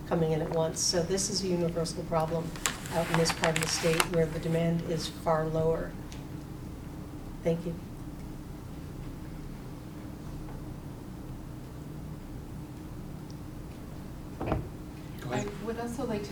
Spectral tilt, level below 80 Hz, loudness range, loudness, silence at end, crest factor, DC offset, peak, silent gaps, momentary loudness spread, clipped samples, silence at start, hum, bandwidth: -4.5 dB/octave; -46 dBFS; 14 LU; -32 LUFS; 0 s; 30 dB; under 0.1%; -4 dBFS; none; 16 LU; under 0.1%; 0 s; none; over 20 kHz